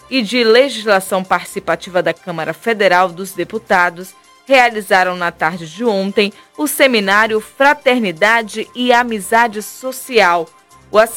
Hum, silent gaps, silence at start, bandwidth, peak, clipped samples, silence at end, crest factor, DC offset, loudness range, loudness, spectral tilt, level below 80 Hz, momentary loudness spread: none; none; 0.1 s; 17 kHz; 0 dBFS; 0.2%; 0 s; 14 dB; under 0.1%; 3 LU; -14 LUFS; -3.5 dB/octave; -56 dBFS; 11 LU